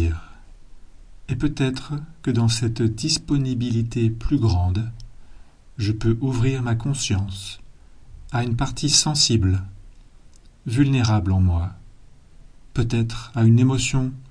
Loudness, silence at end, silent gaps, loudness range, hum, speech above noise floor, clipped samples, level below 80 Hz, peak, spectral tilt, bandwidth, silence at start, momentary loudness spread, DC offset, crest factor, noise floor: -22 LUFS; 0 s; none; 4 LU; none; 26 dB; under 0.1%; -36 dBFS; -2 dBFS; -5 dB/octave; 10.5 kHz; 0 s; 13 LU; under 0.1%; 20 dB; -47 dBFS